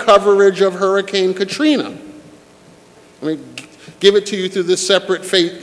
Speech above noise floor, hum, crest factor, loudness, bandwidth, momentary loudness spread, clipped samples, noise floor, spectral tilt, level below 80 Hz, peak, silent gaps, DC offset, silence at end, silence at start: 30 dB; none; 16 dB; -15 LUFS; 11 kHz; 15 LU; under 0.1%; -45 dBFS; -3.5 dB/octave; -58 dBFS; 0 dBFS; none; under 0.1%; 0 s; 0 s